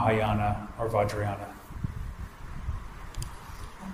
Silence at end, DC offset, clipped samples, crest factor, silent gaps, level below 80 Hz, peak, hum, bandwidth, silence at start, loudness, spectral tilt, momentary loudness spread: 0 s; under 0.1%; under 0.1%; 20 dB; none; -40 dBFS; -12 dBFS; none; 15.5 kHz; 0 s; -32 LUFS; -6.5 dB/octave; 16 LU